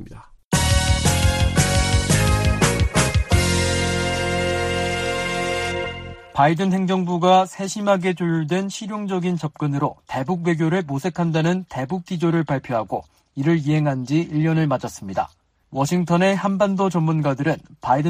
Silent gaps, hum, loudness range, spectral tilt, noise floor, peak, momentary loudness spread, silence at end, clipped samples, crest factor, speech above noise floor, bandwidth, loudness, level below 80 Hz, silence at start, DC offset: 0.45-0.51 s; none; 4 LU; -5 dB/octave; -41 dBFS; -4 dBFS; 9 LU; 0 s; under 0.1%; 16 dB; 21 dB; 15 kHz; -21 LUFS; -32 dBFS; 0 s; under 0.1%